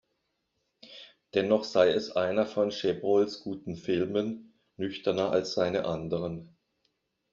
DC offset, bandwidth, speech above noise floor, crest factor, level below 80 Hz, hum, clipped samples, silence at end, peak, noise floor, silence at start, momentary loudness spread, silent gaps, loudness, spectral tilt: under 0.1%; 7.4 kHz; 51 dB; 22 dB; -66 dBFS; none; under 0.1%; 0.85 s; -8 dBFS; -79 dBFS; 0.85 s; 15 LU; none; -29 LUFS; -4.5 dB/octave